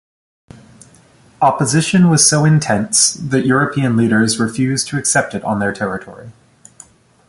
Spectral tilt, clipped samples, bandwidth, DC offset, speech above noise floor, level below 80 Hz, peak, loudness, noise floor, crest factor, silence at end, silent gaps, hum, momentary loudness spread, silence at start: -4 dB/octave; under 0.1%; 11.5 kHz; under 0.1%; 33 dB; -50 dBFS; 0 dBFS; -14 LUFS; -48 dBFS; 16 dB; 1 s; none; none; 9 LU; 1.4 s